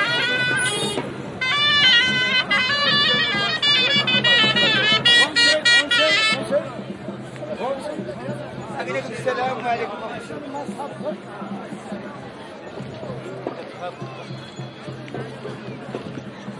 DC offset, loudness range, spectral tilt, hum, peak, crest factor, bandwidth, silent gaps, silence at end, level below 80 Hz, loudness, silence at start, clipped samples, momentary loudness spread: under 0.1%; 18 LU; -2.5 dB/octave; none; -4 dBFS; 18 dB; 11.5 kHz; none; 0 s; -60 dBFS; -17 LUFS; 0 s; under 0.1%; 20 LU